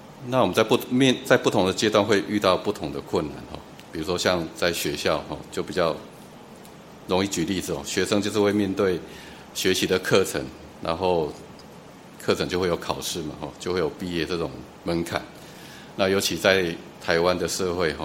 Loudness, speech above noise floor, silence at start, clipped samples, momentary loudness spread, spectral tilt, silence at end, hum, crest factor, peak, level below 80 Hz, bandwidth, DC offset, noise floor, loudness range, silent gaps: -24 LUFS; 21 dB; 0 s; under 0.1%; 20 LU; -4 dB/octave; 0 s; none; 24 dB; -2 dBFS; -52 dBFS; 16.5 kHz; under 0.1%; -45 dBFS; 5 LU; none